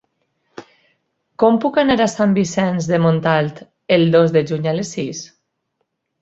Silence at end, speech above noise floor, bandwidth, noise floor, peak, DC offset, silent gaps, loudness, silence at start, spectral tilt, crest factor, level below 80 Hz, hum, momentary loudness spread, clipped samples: 0.95 s; 56 dB; 8.2 kHz; -72 dBFS; -2 dBFS; under 0.1%; none; -17 LUFS; 0.6 s; -6 dB/octave; 16 dB; -56 dBFS; none; 12 LU; under 0.1%